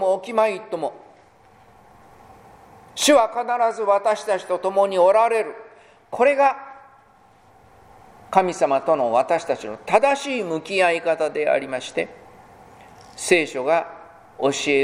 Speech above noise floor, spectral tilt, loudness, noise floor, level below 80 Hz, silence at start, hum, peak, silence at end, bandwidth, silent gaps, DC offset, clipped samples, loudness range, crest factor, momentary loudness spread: 33 dB; -3 dB/octave; -20 LUFS; -53 dBFS; -64 dBFS; 0 s; none; -2 dBFS; 0 s; 16 kHz; none; under 0.1%; under 0.1%; 5 LU; 20 dB; 12 LU